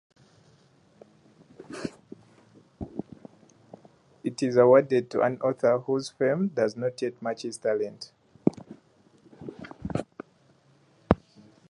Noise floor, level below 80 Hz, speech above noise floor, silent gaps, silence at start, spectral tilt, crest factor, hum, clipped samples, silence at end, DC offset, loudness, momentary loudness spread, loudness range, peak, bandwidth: -62 dBFS; -54 dBFS; 37 dB; none; 1.6 s; -6.5 dB/octave; 28 dB; none; under 0.1%; 0.55 s; under 0.1%; -27 LUFS; 23 LU; 19 LU; 0 dBFS; 11 kHz